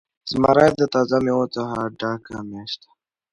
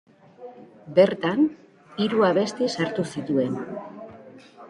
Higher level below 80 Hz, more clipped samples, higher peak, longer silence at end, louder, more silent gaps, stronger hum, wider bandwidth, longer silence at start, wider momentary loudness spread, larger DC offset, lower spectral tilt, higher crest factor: first, -52 dBFS vs -68 dBFS; neither; about the same, -2 dBFS vs -4 dBFS; first, 0.55 s vs 0 s; first, -20 LUFS vs -23 LUFS; neither; neither; about the same, 11.5 kHz vs 11.5 kHz; second, 0.25 s vs 0.4 s; second, 17 LU vs 23 LU; neither; about the same, -6 dB/octave vs -6 dB/octave; about the same, 20 dB vs 20 dB